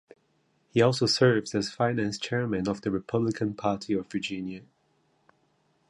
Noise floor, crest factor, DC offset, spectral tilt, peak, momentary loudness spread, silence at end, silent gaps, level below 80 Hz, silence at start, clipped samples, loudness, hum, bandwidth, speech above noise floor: -70 dBFS; 20 dB; under 0.1%; -5.5 dB/octave; -10 dBFS; 10 LU; 1.3 s; none; -60 dBFS; 0.75 s; under 0.1%; -27 LUFS; none; 11.5 kHz; 43 dB